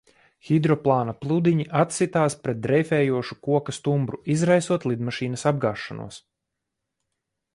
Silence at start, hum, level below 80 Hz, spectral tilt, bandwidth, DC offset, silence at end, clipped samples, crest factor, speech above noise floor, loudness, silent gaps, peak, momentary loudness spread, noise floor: 0.45 s; none; -60 dBFS; -6.5 dB/octave; 11.5 kHz; under 0.1%; 1.35 s; under 0.1%; 18 dB; 59 dB; -23 LUFS; none; -6 dBFS; 7 LU; -82 dBFS